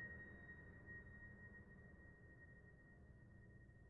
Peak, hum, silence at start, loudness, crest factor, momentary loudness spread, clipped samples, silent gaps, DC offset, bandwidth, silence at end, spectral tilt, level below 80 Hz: -44 dBFS; none; 0 s; -61 LUFS; 16 dB; 8 LU; under 0.1%; none; under 0.1%; 3.8 kHz; 0 s; -3.5 dB/octave; -70 dBFS